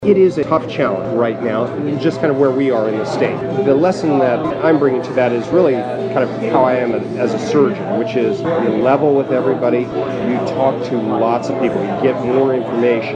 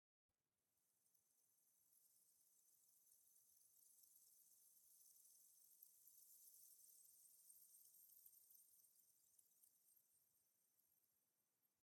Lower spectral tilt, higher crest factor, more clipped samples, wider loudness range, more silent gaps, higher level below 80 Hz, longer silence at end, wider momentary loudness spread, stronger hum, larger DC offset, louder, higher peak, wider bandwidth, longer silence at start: first, -7.5 dB/octave vs 1 dB/octave; second, 14 dB vs 26 dB; neither; about the same, 2 LU vs 2 LU; neither; first, -54 dBFS vs under -90 dBFS; about the same, 0 s vs 0 s; about the same, 5 LU vs 3 LU; neither; neither; first, -16 LUFS vs -68 LUFS; first, -2 dBFS vs -48 dBFS; second, 9 kHz vs 18 kHz; second, 0 s vs 0.3 s